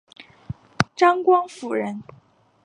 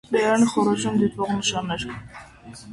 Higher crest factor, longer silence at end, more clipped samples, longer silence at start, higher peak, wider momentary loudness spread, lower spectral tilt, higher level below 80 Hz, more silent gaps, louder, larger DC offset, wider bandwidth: first, 24 dB vs 16 dB; first, 0.65 s vs 0 s; neither; about the same, 0.2 s vs 0.1 s; first, 0 dBFS vs -8 dBFS; about the same, 21 LU vs 23 LU; first, -6 dB/octave vs -4.5 dB/octave; about the same, -54 dBFS vs -52 dBFS; neither; about the same, -21 LUFS vs -22 LUFS; neither; about the same, 11 kHz vs 11.5 kHz